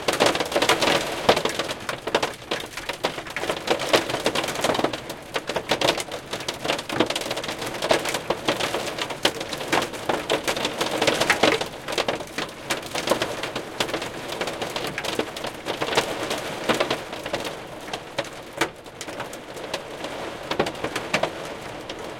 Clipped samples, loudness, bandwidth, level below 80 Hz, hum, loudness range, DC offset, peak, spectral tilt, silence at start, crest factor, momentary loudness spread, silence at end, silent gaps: under 0.1%; -25 LUFS; 17 kHz; -54 dBFS; none; 6 LU; under 0.1%; 0 dBFS; -2.5 dB/octave; 0 s; 26 dB; 11 LU; 0 s; none